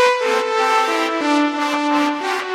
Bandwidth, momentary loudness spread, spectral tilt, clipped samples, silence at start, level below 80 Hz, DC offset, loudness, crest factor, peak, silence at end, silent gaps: 16 kHz; 3 LU; -1.5 dB/octave; under 0.1%; 0 s; -76 dBFS; under 0.1%; -17 LUFS; 14 dB; -2 dBFS; 0 s; none